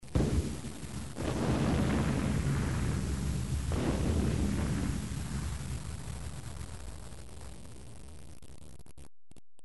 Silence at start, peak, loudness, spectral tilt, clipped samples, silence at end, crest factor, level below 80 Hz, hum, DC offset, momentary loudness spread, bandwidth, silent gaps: 0 s; -16 dBFS; -34 LUFS; -6 dB/octave; under 0.1%; 0 s; 16 dB; -40 dBFS; none; 0.5%; 20 LU; 11.5 kHz; none